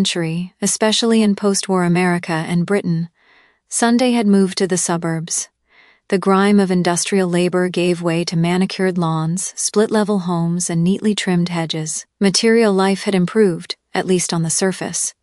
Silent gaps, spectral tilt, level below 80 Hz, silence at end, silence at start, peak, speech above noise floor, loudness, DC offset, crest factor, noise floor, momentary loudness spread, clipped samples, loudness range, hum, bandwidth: none; -4.5 dB/octave; -62 dBFS; 0.1 s; 0 s; 0 dBFS; 37 dB; -17 LUFS; under 0.1%; 16 dB; -54 dBFS; 7 LU; under 0.1%; 1 LU; none; 13.5 kHz